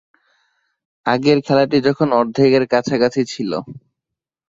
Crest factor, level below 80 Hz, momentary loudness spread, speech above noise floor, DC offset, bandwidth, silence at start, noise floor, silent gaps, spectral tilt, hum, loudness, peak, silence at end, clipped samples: 16 dB; -58 dBFS; 10 LU; 67 dB; under 0.1%; 7.8 kHz; 1.05 s; -83 dBFS; none; -6 dB/octave; none; -17 LUFS; -2 dBFS; 0.7 s; under 0.1%